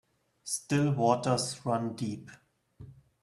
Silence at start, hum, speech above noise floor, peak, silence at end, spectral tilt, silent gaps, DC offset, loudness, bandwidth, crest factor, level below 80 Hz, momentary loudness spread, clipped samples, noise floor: 0.45 s; none; 23 dB; -10 dBFS; 0.3 s; -5 dB/octave; none; under 0.1%; -30 LUFS; 13 kHz; 22 dB; -66 dBFS; 11 LU; under 0.1%; -53 dBFS